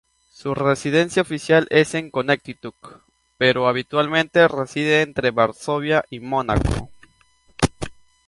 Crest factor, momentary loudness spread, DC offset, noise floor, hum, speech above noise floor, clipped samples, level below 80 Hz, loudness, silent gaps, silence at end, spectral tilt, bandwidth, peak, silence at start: 20 dB; 11 LU; under 0.1%; -58 dBFS; none; 38 dB; under 0.1%; -38 dBFS; -20 LUFS; none; 0.35 s; -5 dB/octave; 11.5 kHz; -2 dBFS; 0.4 s